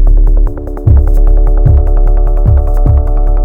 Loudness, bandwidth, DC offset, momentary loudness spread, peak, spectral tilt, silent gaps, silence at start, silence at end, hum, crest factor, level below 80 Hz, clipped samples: -11 LUFS; 1.8 kHz; under 0.1%; 4 LU; 0 dBFS; -11 dB/octave; none; 0 s; 0 s; none; 6 dB; -6 dBFS; 2%